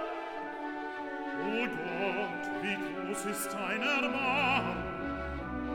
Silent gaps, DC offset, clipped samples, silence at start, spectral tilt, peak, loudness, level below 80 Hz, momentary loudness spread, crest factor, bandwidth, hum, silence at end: none; under 0.1%; under 0.1%; 0 s; -4 dB/octave; -16 dBFS; -33 LUFS; -52 dBFS; 10 LU; 18 dB; 19 kHz; none; 0 s